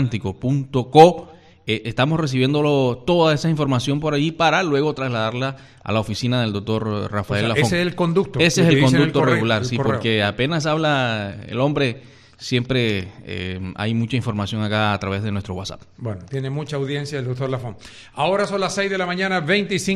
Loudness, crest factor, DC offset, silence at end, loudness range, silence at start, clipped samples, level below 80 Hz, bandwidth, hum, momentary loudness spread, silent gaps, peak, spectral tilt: -20 LUFS; 20 dB; under 0.1%; 0 s; 7 LU; 0 s; under 0.1%; -50 dBFS; 13 kHz; none; 12 LU; none; 0 dBFS; -5.5 dB/octave